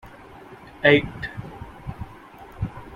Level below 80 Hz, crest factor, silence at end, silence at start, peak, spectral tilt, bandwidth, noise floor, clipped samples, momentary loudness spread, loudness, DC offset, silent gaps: -46 dBFS; 24 dB; 0 s; 0.05 s; -2 dBFS; -7 dB/octave; 13 kHz; -44 dBFS; under 0.1%; 27 LU; -22 LUFS; under 0.1%; none